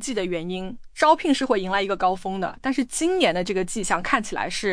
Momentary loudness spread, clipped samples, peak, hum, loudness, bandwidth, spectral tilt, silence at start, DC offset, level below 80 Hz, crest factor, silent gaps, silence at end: 9 LU; under 0.1%; -4 dBFS; none; -23 LUFS; 10.5 kHz; -3.5 dB/octave; 0 s; under 0.1%; -46 dBFS; 18 dB; none; 0 s